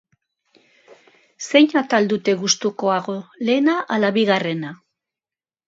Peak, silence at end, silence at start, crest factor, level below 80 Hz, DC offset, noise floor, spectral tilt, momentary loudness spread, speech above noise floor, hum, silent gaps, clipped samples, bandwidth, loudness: 0 dBFS; 0.9 s; 1.4 s; 20 dB; -72 dBFS; under 0.1%; under -90 dBFS; -4 dB/octave; 12 LU; over 71 dB; none; none; under 0.1%; 7.8 kHz; -19 LUFS